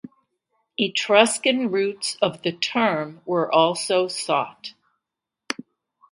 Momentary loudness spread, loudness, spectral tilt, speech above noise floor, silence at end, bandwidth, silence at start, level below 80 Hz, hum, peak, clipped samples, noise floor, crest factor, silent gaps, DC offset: 15 LU; -22 LUFS; -3 dB/octave; 64 dB; 0.6 s; 11.5 kHz; 0.05 s; -74 dBFS; none; 0 dBFS; under 0.1%; -86 dBFS; 22 dB; none; under 0.1%